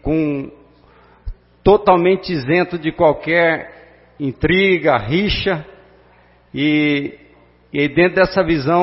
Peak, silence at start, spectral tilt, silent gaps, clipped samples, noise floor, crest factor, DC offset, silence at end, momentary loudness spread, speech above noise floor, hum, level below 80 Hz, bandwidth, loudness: 0 dBFS; 0.05 s; -10 dB/octave; none; under 0.1%; -50 dBFS; 16 dB; under 0.1%; 0 s; 14 LU; 35 dB; 60 Hz at -45 dBFS; -38 dBFS; 5.8 kHz; -16 LUFS